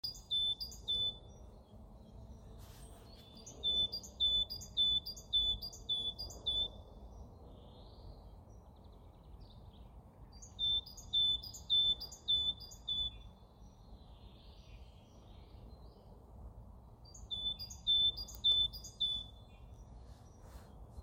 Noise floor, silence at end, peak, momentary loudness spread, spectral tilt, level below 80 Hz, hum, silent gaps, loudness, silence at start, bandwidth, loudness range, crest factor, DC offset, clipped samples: -58 dBFS; 0 s; -24 dBFS; 26 LU; -2.5 dB/octave; -56 dBFS; none; none; -34 LUFS; 0.05 s; 16.5 kHz; 11 LU; 18 dB; under 0.1%; under 0.1%